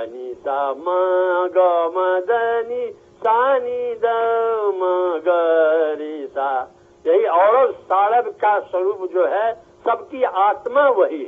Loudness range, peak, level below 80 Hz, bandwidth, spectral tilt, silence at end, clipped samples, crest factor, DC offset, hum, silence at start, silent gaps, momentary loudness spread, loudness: 2 LU; -4 dBFS; -68 dBFS; 3.9 kHz; -1 dB/octave; 0 s; under 0.1%; 14 dB; under 0.1%; none; 0 s; none; 9 LU; -19 LUFS